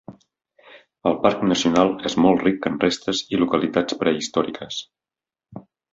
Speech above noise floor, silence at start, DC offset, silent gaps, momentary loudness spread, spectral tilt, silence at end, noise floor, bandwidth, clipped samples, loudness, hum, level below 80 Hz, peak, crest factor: over 70 dB; 0.1 s; under 0.1%; none; 8 LU; -5 dB/octave; 0.3 s; under -90 dBFS; 7.8 kHz; under 0.1%; -21 LUFS; none; -56 dBFS; -2 dBFS; 20 dB